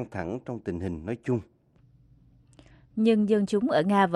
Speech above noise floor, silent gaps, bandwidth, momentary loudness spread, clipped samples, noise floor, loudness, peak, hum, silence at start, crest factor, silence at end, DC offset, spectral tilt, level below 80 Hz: 34 dB; none; 11.5 kHz; 12 LU; under 0.1%; -60 dBFS; -27 LUFS; -10 dBFS; none; 0 s; 16 dB; 0 s; under 0.1%; -7.5 dB/octave; -56 dBFS